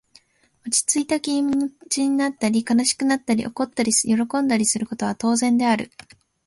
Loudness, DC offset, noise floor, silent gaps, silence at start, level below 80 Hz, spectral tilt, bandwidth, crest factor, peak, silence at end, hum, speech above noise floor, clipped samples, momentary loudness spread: -21 LUFS; under 0.1%; -59 dBFS; none; 0.65 s; -60 dBFS; -3 dB/octave; 12 kHz; 16 dB; -6 dBFS; 0.6 s; none; 38 dB; under 0.1%; 6 LU